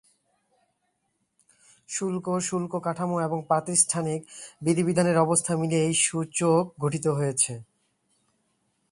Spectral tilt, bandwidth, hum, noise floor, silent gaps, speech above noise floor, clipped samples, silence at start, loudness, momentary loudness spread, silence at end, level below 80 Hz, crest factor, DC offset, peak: -4.5 dB/octave; 11.5 kHz; none; -76 dBFS; none; 50 dB; under 0.1%; 1.9 s; -25 LUFS; 9 LU; 1.3 s; -68 dBFS; 20 dB; under 0.1%; -6 dBFS